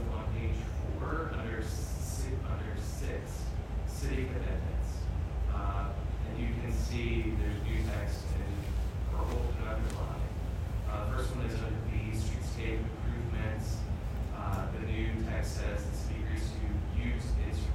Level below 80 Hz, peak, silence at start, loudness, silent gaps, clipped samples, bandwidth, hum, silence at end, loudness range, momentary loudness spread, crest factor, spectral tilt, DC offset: -36 dBFS; -20 dBFS; 0 s; -36 LUFS; none; under 0.1%; 14.5 kHz; none; 0 s; 2 LU; 3 LU; 14 dB; -6.5 dB/octave; under 0.1%